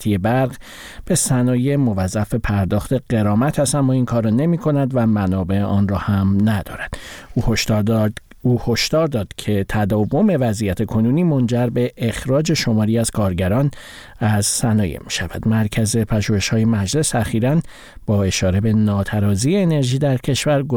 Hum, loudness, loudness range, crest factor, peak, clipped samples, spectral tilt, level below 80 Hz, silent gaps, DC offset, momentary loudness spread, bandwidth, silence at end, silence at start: none; -18 LUFS; 1 LU; 12 dB; -6 dBFS; under 0.1%; -5.5 dB/octave; -38 dBFS; none; 0.1%; 6 LU; 18 kHz; 0 s; 0 s